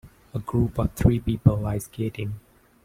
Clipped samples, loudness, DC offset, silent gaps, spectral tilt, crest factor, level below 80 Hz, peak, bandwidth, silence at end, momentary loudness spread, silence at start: under 0.1%; -25 LUFS; under 0.1%; none; -8 dB/octave; 22 dB; -38 dBFS; -4 dBFS; 16 kHz; 0.45 s; 13 LU; 0.05 s